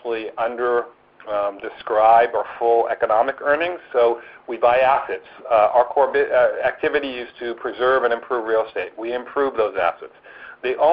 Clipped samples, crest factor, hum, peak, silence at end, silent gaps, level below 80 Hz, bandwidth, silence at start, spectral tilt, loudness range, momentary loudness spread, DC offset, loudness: under 0.1%; 16 dB; none; -4 dBFS; 0 s; none; -58 dBFS; 5.2 kHz; 0.05 s; -1.5 dB/octave; 4 LU; 13 LU; under 0.1%; -20 LUFS